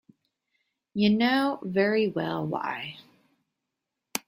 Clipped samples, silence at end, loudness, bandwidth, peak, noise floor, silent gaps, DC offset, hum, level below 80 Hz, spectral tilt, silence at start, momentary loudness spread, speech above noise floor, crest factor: under 0.1%; 0.1 s; -26 LUFS; 16 kHz; -6 dBFS; -85 dBFS; none; under 0.1%; none; -68 dBFS; -5 dB/octave; 0.95 s; 13 LU; 59 dB; 22 dB